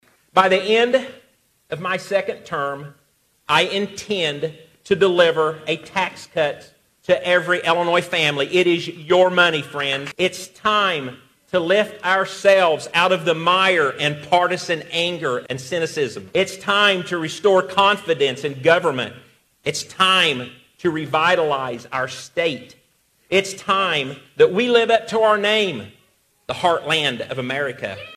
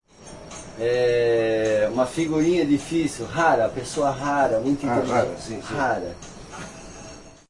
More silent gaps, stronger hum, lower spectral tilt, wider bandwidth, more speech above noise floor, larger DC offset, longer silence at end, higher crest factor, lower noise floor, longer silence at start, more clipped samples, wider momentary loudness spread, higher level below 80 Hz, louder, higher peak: neither; neither; second, -4 dB/octave vs -5.5 dB/octave; first, 14.5 kHz vs 11.5 kHz; first, 43 dB vs 20 dB; neither; second, 0 s vs 0.2 s; about the same, 20 dB vs 16 dB; first, -62 dBFS vs -42 dBFS; first, 0.35 s vs 0.2 s; neither; second, 10 LU vs 19 LU; second, -62 dBFS vs -50 dBFS; first, -19 LUFS vs -22 LUFS; first, 0 dBFS vs -6 dBFS